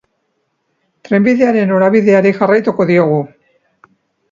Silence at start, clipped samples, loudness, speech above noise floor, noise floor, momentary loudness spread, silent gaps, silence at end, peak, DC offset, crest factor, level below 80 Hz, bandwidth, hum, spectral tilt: 1.1 s; under 0.1%; -12 LUFS; 55 dB; -66 dBFS; 6 LU; none; 1.05 s; 0 dBFS; under 0.1%; 14 dB; -60 dBFS; 7.4 kHz; none; -8.5 dB/octave